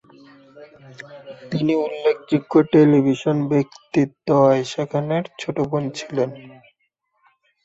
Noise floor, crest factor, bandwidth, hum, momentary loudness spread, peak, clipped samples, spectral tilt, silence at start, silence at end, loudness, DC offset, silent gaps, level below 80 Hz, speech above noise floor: -70 dBFS; 18 dB; 8 kHz; none; 17 LU; -4 dBFS; under 0.1%; -7.5 dB/octave; 0.55 s; 1.15 s; -20 LUFS; under 0.1%; none; -62 dBFS; 51 dB